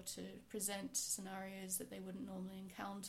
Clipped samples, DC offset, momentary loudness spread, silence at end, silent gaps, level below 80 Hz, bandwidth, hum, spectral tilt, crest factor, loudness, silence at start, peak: under 0.1%; under 0.1%; 10 LU; 0 s; none; -74 dBFS; 16 kHz; none; -3 dB/octave; 20 dB; -45 LUFS; 0 s; -28 dBFS